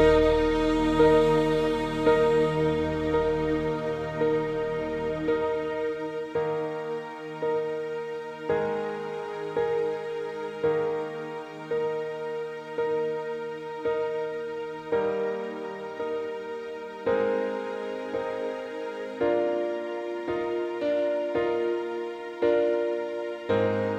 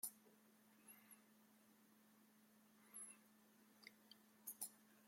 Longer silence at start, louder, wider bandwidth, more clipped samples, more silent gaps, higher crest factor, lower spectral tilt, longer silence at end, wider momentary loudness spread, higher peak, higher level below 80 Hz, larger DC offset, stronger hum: about the same, 0 s vs 0 s; first, -28 LUFS vs -58 LUFS; second, 9.6 kHz vs 16.5 kHz; neither; neither; second, 18 dB vs 32 dB; first, -7 dB/octave vs -1 dB/octave; about the same, 0 s vs 0 s; second, 11 LU vs 15 LU; first, -8 dBFS vs -32 dBFS; first, -46 dBFS vs under -90 dBFS; neither; neither